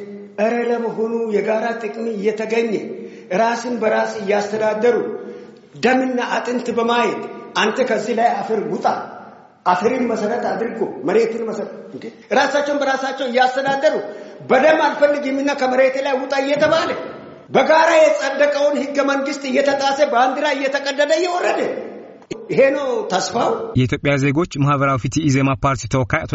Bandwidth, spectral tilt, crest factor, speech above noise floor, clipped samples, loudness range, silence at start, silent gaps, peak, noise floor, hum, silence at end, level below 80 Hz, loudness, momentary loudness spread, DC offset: 8 kHz; -4 dB/octave; 16 dB; 22 dB; under 0.1%; 4 LU; 0 s; none; -2 dBFS; -40 dBFS; none; 0 s; -50 dBFS; -18 LUFS; 11 LU; under 0.1%